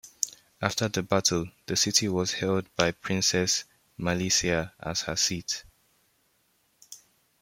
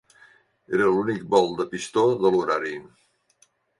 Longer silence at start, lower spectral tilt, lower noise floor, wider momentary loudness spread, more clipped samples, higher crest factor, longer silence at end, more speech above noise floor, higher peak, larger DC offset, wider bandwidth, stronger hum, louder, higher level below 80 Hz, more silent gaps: second, 0.05 s vs 0.7 s; second, -3 dB/octave vs -5.5 dB/octave; first, -69 dBFS vs -64 dBFS; about the same, 10 LU vs 9 LU; neither; first, 26 dB vs 20 dB; second, 0.45 s vs 0.95 s; about the same, 42 dB vs 41 dB; about the same, -4 dBFS vs -6 dBFS; neither; first, 16.5 kHz vs 11.5 kHz; neither; second, -27 LUFS vs -23 LUFS; first, -56 dBFS vs -64 dBFS; neither